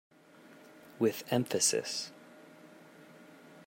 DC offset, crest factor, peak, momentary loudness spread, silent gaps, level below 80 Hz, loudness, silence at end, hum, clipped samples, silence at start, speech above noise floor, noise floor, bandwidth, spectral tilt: under 0.1%; 22 dB; -16 dBFS; 27 LU; none; -84 dBFS; -32 LUFS; 0.05 s; none; under 0.1%; 0.5 s; 26 dB; -58 dBFS; 16.5 kHz; -3 dB/octave